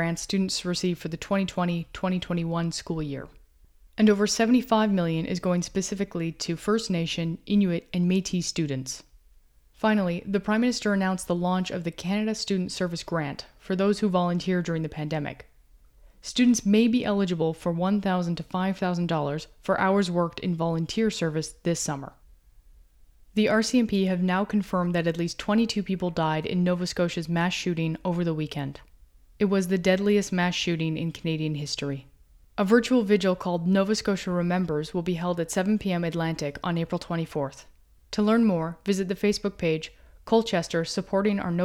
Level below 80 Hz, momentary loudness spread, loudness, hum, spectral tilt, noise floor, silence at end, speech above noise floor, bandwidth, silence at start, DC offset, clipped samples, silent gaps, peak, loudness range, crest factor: -54 dBFS; 9 LU; -26 LUFS; none; -5.5 dB/octave; -57 dBFS; 0 s; 32 dB; 16 kHz; 0 s; under 0.1%; under 0.1%; none; -8 dBFS; 3 LU; 18 dB